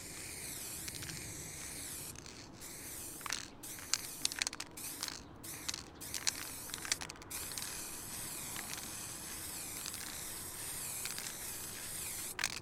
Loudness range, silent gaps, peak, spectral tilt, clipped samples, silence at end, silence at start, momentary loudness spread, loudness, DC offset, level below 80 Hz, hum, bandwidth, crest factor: 3 LU; none; -10 dBFS; -1 dB/octave; under 0.1%; 0 s; 0 s; 7 LU; -41 LUFS; under 0.1%; -62 dBFS; none; 18 kHz; 34 dB